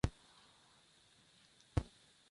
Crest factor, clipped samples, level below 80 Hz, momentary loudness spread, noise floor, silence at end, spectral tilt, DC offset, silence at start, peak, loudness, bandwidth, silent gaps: 28 dB; under 0.1%; -52 dBFS; 23 LU; -69 dBFS; 0.5 s; -6.5 dB/octave; under 0.1%; 0.05 s; -18 dBFS; -44 LUFS; 11.5 kHz; none